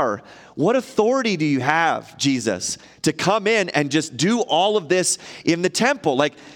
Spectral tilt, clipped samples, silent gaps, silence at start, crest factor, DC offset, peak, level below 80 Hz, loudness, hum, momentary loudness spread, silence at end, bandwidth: -4 dB/octave; under 0.1%; none; 0 s; 20 dB; under 0.1%; 0 dBFS; -64 dBFS; -20 LUFS; none; 6 LU; 0 s; 17 kHz